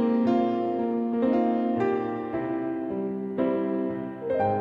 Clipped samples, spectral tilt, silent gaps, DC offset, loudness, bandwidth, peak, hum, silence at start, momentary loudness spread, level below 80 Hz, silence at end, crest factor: under 0.1%; -9.5 dB/octave; none; under 0.1%; -27 LUFS; 5.4 kHz; -12 dBFS; none; 0 s; 7 LU; -64 dBFS; 0 s; 14 dB